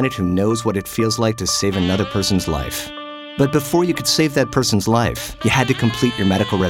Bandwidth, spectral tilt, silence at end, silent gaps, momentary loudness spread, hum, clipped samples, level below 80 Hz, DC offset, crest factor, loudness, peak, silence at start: 18 kHz; -4.5 dB/octave; 0 s; none; 6 LU; none; under 0.1%; -40 dBFS; under 0.1%; 14 dB; -18 LUFS; -4 dBFS; 0 s